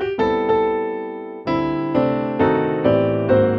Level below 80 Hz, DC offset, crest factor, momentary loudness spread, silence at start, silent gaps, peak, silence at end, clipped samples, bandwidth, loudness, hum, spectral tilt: -46 dBFS; under 0.1%; 16 dB; 8 LU; 0 s; none; -2 dBFS; 0 s; under 0.1%; 6 kHz; -19 LUFS; none; -9.5 dB/octave